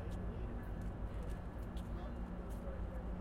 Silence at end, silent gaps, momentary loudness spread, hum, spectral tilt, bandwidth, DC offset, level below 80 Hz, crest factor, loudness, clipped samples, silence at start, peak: 0 s; none; 2 LU; none; -8 dB/octave; 13.5 kHz; under 0.1%; -46 dBFS; 12 dB; -46 LUFS; under 0.1%; 0 s; -32 dBFS